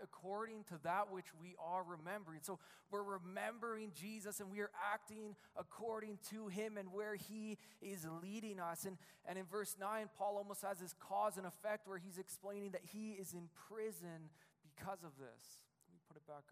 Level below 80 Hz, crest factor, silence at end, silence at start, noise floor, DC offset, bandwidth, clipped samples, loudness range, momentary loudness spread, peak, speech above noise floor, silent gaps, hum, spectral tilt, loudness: under -90 dBFS; 20 dB; 0.1 s; 0 s; -71 dBFS; under 0.1%; 15.5 kHz; under 0.1%; 6 LU; 12 LU; -30 dBFS; 23 dB; none; none; -4.5 dB/octave; -48 LUFS